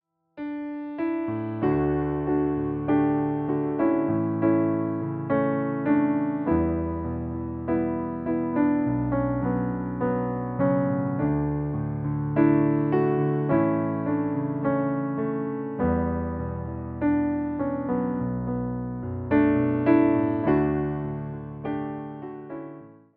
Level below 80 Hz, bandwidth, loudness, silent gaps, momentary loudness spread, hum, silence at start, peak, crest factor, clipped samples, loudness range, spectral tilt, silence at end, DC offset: -46 dBFS; 3.6 kHz; -26 LUFS; none; 10 LU; none; 0.35 s; -8 dBFS; 18 dB; under 0.1%; 3 LU; -13 dB/octave; 0.25 s; under 0.1%